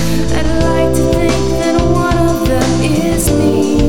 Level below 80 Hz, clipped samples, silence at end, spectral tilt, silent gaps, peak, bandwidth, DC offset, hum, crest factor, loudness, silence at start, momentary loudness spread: -22 dBFS; under 0.1%; 0 s; -6 dB/octave; none; 0 dBFS; 18 kHz; under 0.1%; none; 12 dB; -13 LUFS; 0 s; 2 LU